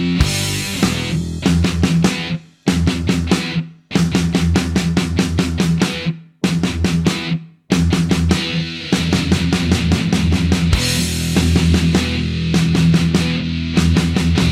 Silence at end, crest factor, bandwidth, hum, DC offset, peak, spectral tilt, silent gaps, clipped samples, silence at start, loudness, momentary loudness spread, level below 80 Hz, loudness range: 0 s; 16 dB; 15.5 kHz; none; under 0.1%; 0 dBFS; -5.5 dB/octave; none; under 0.1%; 0 s; -17 LUFS; 6 LU; -28 dBFS; 2 LU